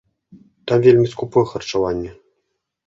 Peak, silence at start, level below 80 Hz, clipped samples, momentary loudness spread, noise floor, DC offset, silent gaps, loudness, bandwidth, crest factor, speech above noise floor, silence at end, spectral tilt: -2 dBFS; 0.65 s; -48 dBFS; under 0.1%; 16 LU; -74 dBFS; under 0.1%; none; -17 LUFS; 7.6 kHz; 18 dB; 57 dB; 0.75 s; -7 dB/octave